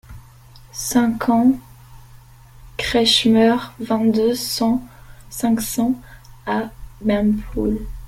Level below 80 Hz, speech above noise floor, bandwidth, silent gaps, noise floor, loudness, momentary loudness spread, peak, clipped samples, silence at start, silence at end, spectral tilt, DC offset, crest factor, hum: -40 dBFS; 26 dB; 16.5 kHz; none; -44 dBFS; -19 LUFS; 13 LU; -2 dBFS; under 0.1%; 0.1 s; 0 s; -4 dB/octave; under 0.1%; 18 dB; none